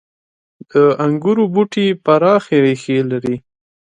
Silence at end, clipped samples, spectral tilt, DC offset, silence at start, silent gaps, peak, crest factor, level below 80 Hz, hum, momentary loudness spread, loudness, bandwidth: 0.6 s; under 0.1%; -7 dB/octave; under 0.1%; 0.75 s; none; 0 dBFS; 16 dB; -60 dBFS; none; 7 LU; -15 LUFS; 9.6 kHz